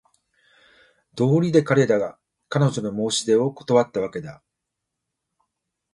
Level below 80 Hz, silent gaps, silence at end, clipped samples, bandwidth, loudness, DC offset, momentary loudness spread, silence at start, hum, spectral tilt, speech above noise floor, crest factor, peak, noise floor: -64 dBFS; none; 1.6 s; under 0.1%; 11.5 kHz; -21 LUFS; under 0.1%; 13 LU; 1.15 s; none; -6 dB/octave; 61 dB; 20 dB; -4 dBFS; -82 dBFS